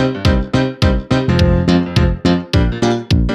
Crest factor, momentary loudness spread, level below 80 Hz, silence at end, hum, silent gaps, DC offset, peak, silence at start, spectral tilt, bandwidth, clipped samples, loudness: 14 dB; 3 LU; -22 dBFS; 0 s; none; none; under 0.1%; 0 dBFS; 0 s; -7 dB/octave; 12 kHz; under 0.1%; -15 LUFS